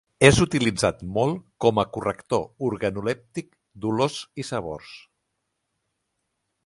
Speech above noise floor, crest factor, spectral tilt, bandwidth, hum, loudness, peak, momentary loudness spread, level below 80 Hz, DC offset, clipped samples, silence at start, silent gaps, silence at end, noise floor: 54 dB; 24 dB; -5 dB/octave; 11.5 kHz; none; -24 LUFS; 0 dBFS; 16 LU; -48 dBFS; under 0.1%; under 0.1%; 0.2 s; none; 1.65 s; -78 dBFS